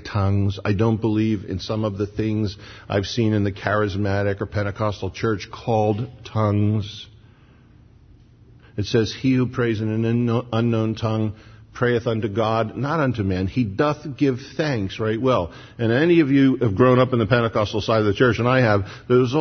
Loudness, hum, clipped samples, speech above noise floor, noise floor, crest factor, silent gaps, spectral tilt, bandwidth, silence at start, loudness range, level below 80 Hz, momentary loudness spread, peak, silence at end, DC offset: -21 LUFS; none; under 0.1%; 30 dB; -50 dBFS; 20 dB; none; -7.5 dB/octave; 6.6 kHz; 0 s; 7 LU; -48 dBFS; 9 LU; -2 dBFS; 0 s; under 0.1%